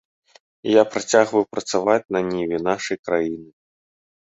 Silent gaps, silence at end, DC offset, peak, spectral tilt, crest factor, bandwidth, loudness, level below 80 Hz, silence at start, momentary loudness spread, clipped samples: 2.99-3.03 s; 0.8 s; under 0.1%; -2 dBFS; -4 dB/octave; 20 dB; 8 kHz; -21 LUFS; -60 dBFS; 0.65 s; 8 LU; under 0.1%